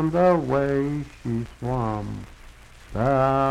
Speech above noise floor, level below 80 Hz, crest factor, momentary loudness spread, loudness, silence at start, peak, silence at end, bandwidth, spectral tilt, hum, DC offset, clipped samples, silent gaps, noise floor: 23 dB; -42 dBFS; 16 dB; 16 LU; -24 LUFS; 0 s; -6 dBFS; 0 s; 12 kHz; -8.5 dB/octave; none; under 0.1%; under 0.1%; none; -46 dBFS